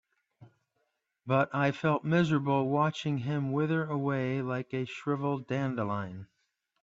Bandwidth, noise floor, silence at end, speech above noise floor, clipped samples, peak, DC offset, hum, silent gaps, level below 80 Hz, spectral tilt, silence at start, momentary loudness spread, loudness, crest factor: 7.8 kHz; -79 dBFS; 0.6 s; 49 dB; under 0.1%; -14 dBFS; under 0.1%; none; none; -70 dBFS; -7.5 dB/octave; 0.4 s; 8 LU; -30 LUFS; 18 dB